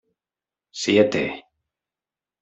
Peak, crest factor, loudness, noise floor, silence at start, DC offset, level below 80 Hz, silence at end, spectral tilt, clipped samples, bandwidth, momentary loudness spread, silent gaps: -4 dBFS; 22 dB; -21 LUFS; under -90 dBFS; 0.75 s; under 0.1%; -62 dBFS; 1 s; -4.5 dB/octave; under 0.1%; 8.2 kHz; 21 LU; none